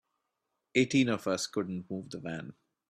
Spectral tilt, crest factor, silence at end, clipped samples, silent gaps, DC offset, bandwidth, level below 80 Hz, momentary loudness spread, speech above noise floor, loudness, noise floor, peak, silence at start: -5 dB/octave; 20 dB; 0.4 s; under 0.1%; none; under 0.1%; 14 kHz; -70 dBFS; 13 LU; 52 dB; -32 LUFS; -84 dBFS; -12 dBFS; 0.75 s